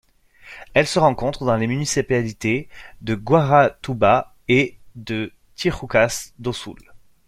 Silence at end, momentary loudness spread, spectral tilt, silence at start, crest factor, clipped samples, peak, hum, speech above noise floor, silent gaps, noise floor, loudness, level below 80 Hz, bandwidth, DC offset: 0.3 s; 15 LU; -5 dB/octave; 0.45 s; 18 dB; under 0.1%; -2 dBFS; none; 27 dB; none; -46 dBFS; -20 LUFS; -46 dBFS; 14.5 kHz; under 0.1%